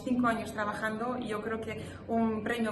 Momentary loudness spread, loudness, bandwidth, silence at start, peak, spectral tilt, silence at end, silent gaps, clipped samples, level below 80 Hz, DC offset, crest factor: 7 LU; -33 LUFS; 12.5 kHz; 0 s; -18 dBFS; -6 dB/octave; 0 s; none; under 0.1%; -60 dBFS; under 0.1%; 16 dB